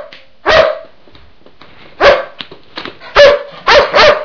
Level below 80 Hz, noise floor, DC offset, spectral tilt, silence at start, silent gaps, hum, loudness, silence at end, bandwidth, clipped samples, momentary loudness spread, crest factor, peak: -36 dBFS; -43 dBFS; under 0.1%; -3 dB/octave; 0 s; none; none; -9 LUFS; 0 s; 5.4 kHz; 3%; 20 LU; 12 dB; 0 dBFS